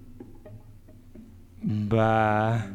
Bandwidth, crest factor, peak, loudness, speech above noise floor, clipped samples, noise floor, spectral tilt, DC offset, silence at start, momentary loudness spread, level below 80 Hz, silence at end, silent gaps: 8.8 kHz; 18 dB; -10 dBFS; -25 LUFS; 25 dB; under 0.1%; -48 dBFS; -8 dB/octave; under 0.1%; 0 s; 25 LU; -48 dBFS; 0 s; none